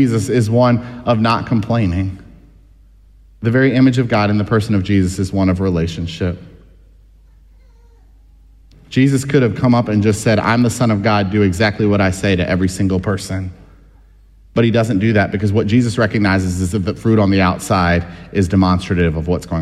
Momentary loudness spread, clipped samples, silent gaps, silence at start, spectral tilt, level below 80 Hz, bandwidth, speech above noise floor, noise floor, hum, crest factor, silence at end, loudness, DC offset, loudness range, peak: 8 LU; under 0.1%; none; 0 s; -6.5 dB/octave; -38 dBFS; 13 kHz; 31 dB; -45 dBFS; none; 14 dB; 0 s; -16 LUFS; under 0.1%; 6 LU; 0 dBFS